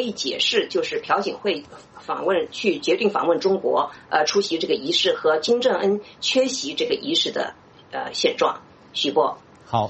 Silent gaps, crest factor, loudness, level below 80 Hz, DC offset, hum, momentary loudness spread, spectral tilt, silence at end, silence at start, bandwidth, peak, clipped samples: none; 18 dB; -22 LUFS; -64 dBFS; under 0.1%; none; 9 LU; -3 dB/octave; 0 s; 0 s; 8.4 kHz; -6 dBFS; under 0.1%